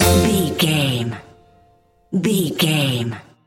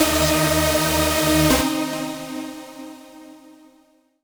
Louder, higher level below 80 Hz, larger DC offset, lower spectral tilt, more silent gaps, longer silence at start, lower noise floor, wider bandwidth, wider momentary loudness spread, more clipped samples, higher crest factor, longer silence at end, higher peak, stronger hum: about the same, -19 LUFS vs -19 LUFS; about the same, -38 dBFS vs -36 dBFS; neither; about the same, -4.5 dB/octave vs -3.5 dB/octave; neither; about the same, 0 s vs 0 s; about the same, -55 dBFS vs -58 dBFS; second, 17 kHz vs over 20 kHz; second, 11 LU vs 20 LU; neither; about the same, 18 dB vs 18 dB; second, 0.25 s vs 0.85 s; about the same, -2 dBFS vs -2 dBFS; neither